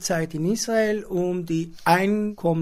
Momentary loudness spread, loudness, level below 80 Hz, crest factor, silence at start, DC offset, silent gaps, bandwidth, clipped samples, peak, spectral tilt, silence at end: 6 LU; -23 LUFS; -52 dBFS; 18 dB; 0 s; under 0.1%; none; 16 kHz; under 0.1%; -4 dBFS; -5 dB/octave; 0 s